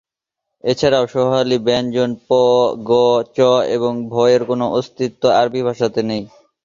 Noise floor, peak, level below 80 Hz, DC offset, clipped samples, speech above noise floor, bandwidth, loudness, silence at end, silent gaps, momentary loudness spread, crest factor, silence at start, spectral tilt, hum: -81 dBFS; -2 dBFS; -54 dBFS; under 0.1%; under 0.1%; 65 dB; 7.4 kHz; -16 LUFS; 0.35 s; none; 6 LU; 16 dB; 0.65 s; -5.5 dB/octave; none